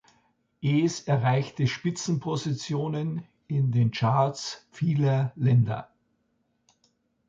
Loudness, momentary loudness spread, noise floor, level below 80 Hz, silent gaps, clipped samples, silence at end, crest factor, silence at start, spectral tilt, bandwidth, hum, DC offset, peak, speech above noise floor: -27 LUFS; 8 LU; -73 dBFS; -64 dBFS; none; under 0.1%; 1.45 s; 16 dB; 0.6 s; -6.5 dB/octave; 7.8 kHz; none; under 0.1%; -10 dBFS; 47 dB